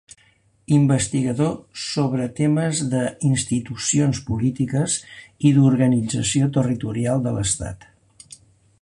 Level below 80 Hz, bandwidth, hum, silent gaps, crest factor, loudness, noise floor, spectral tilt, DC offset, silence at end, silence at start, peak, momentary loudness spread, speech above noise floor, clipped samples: -48 dBFS; 11.5 kHz; none; none; 16 dB; -21 LUFS; -59 dBFS; -5.5 dB/octave; under 0.1%; 1.05 s; 0.7 s; -4 dBFS; 8 LU; 39 dB; under 0.1%